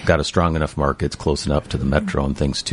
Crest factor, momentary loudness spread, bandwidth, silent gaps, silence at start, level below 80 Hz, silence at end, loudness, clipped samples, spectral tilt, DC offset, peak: 18 dB; 4 LU; 11.5 kHz; none; 0 s; -28 dBFS; 0 s; -21 LUFS; under 0.1%; -5.5 dB/octave; under 0.1%; 0 dBFS